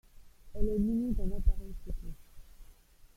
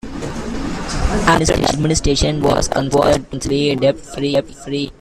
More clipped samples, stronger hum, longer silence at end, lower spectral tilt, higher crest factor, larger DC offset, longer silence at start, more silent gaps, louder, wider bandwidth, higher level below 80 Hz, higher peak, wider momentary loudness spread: neither; neither; first, 0.45 s vs 0.1 s; first, -9.5 dB/octave vs -4.5 dB/octave; about the same, 18 dB vs 16 dB; neither; about the same, 0.15 s vs 0.05 s; neither; second, -35 LUFS vs -17 LUFS; about the same, 13.5 kHz vs 14 kHz; second, -36 dBFS vs -28 dBFS; second, -14 dBFS vs 0 dBFS; first, 20 LU vs 10 LU